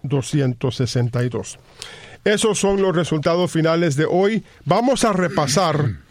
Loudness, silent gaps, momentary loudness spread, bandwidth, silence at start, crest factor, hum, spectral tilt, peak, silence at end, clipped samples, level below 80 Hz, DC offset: -19 LUFS; none; 9 LU; 15.5 kHz; 0.05 s; 18 dB; none; -5.5 dB/octave; -2 dBFS; 0.1 s; under 0.1%; -46 dBFS; under 0.1%